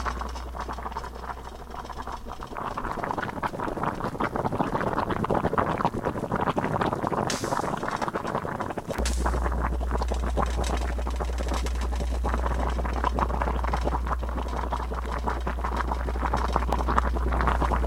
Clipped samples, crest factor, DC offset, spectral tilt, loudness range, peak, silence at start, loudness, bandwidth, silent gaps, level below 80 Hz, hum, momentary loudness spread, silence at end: under 0.1%; 24 dB; under 0.1%; -6 dB/octave; 4 LU; -4 dBFS; 0 s; -29 LUFS; 14.5 kHz; none; -30 dBFS; none; 9 LU; 0 s